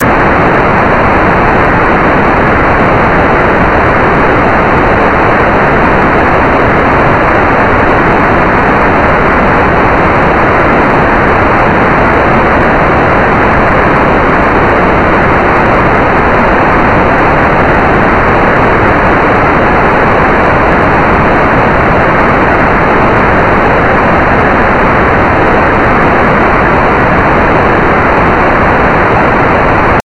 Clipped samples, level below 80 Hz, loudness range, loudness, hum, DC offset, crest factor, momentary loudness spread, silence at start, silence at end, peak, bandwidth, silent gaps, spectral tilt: 0.6%; -20 dBFS; 0 LU; -6 LUFS; none; under 0.1%; 6 dB; 0 LU; 0 s; 0.05 s; 0 dBFS; 11.5 kHz; none; -7.5 dB/octave